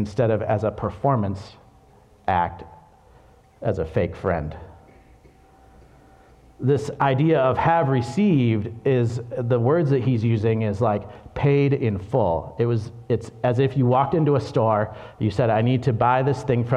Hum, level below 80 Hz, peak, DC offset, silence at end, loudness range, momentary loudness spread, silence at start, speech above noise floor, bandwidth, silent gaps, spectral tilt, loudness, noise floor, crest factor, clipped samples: none; -48 dBFS; -6 dBFS; under 0.1%; 0 s; 8 LU; 8 LU; 0 s; 32 dB; 9.2 kHz; none; -8.5 dB/octave; -22 LUFS; -53 dBFS; 16 dB; under 0.1%